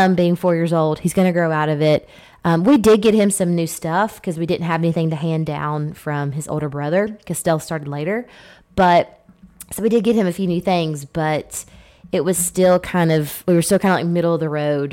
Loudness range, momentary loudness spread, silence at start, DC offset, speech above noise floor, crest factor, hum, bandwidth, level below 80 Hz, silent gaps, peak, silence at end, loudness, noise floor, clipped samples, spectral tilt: 5 LU; 9 LU; 0 s; under 0.1%; 25 dB; 12 dB; none; 17 kHz; -50 dBFS; none; -6 dBFS; 0 s; -18 LUFS; -43 dBFS; under 0.1%; -6 dB/octave